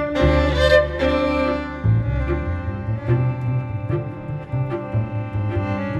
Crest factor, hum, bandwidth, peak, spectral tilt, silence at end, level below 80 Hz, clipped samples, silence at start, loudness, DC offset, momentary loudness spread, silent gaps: 18 dB; none; 8.8 kHz; -2 dBFS; -7.5 dB/octave; 0 s; -30 dBFS; under 0.1%; 0 s; -21 LUFS; under 0.1%; 10 LU; none